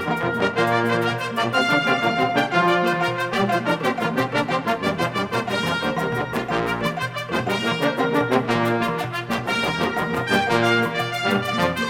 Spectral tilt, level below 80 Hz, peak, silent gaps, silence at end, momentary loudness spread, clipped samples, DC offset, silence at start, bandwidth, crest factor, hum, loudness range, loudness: -5 dB/octave; -54 dBFS; -4 dBFS; none; 0 s; 5 LU; under 0.1%; under 0.1%; 0 s; 17 kHz; 18 dB; none; 3 LU; -21 LUFS